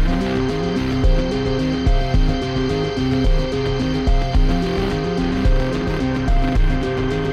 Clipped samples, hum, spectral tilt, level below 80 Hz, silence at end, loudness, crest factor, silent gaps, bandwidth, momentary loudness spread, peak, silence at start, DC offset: under 0.1%; none; -7 dB/octave; -20 dBFS; 0 s; -20 LUFS; 12 dB; none; 8 kHz; 2 LU; -6 dBFS; 0 s; under 0.1%